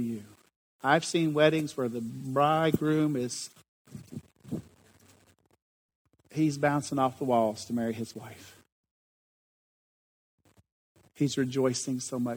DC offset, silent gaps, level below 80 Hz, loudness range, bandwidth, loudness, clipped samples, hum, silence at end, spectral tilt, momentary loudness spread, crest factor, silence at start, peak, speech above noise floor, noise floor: under 0.1%; 0.56-0.79 s, 3.68-3.85 s, 5.62-5.89 s, 5.95-6.05 s, 8.72-8.84 s, 8.91-10.38 s, 10.72-10.95 s; -72 dBFS; 13 LU; over 20 kHz; -29 LUFS; under 0.1%; none; 0 s; -5.5 dB/octave; 20 LU; 22 dB; 0 s; -8 dBFS; 36 dB; -64 dBFS